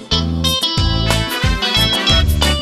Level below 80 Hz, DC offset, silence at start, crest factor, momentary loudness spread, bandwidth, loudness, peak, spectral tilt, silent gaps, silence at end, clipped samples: -22 dBFS; under 0.1%; 0 s; 16 dB; 4 LU; 13.5 kHz; -14 LUFS; 0 dBFS; -4 dB/octave; none; 0 s; under 0.1%